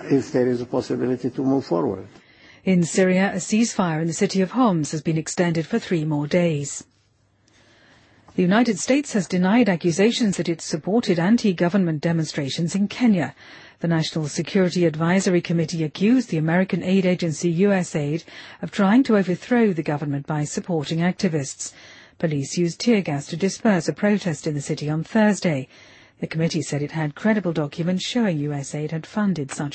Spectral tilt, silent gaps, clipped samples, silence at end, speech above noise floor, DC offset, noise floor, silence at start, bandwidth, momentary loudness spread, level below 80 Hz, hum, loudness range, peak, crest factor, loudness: -6 dB/octave; none; under 0.1%; 0 s; 41 dB; under 0.1%; -62 dBFS; 0 s; 8.8 kHz; 8 LU; -62 dBFS; none; 4 LU; -6 dBFS; 16 dB; -22 LUFS